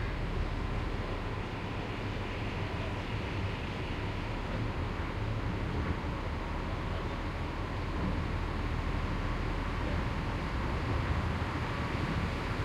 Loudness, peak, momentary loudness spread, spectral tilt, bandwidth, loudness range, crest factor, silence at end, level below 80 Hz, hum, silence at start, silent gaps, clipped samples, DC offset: -36 LUFS; -20 dBFS; 3 LU; -6.5 dB/octave; 12 kHz; 2 LU; 14 dB; 0 s; -40 dBFS; none; 0 s; none; under 0.1%; under 0.1%